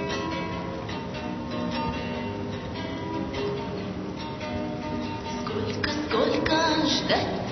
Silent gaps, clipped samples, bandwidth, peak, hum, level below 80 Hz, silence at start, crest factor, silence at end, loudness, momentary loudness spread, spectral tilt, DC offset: none; under 0.1%; 6.4 kHz; -8 dBFS; none; -48 dBFS; 0 s; 20 dB; 0 s; -28 LUFS; 10 LU; -5 dB/octave; under 0.1%